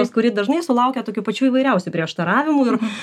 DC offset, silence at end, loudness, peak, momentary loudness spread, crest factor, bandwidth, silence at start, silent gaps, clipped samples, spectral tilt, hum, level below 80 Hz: under 0.1%; 0 s; -19 LUFS; -4 dBFS; 6 LU; 16 dB; 12 kHz; 0 s; none; under 0.1%; -6 dB/octave; none; -76 dBFS